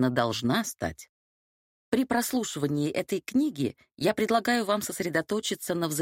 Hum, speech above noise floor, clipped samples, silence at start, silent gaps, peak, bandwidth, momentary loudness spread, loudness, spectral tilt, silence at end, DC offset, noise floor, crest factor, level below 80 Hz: none; over 62 dB; under 0.1%; 0 s; 1.09-1.92 s; -8 dBFS; 16.5 kHz; 7 LU; -28 LUFS; -4.5 dB/octave; 0 s; under 0.1%; under -90 dBFS; 20 dB; -60 dBFS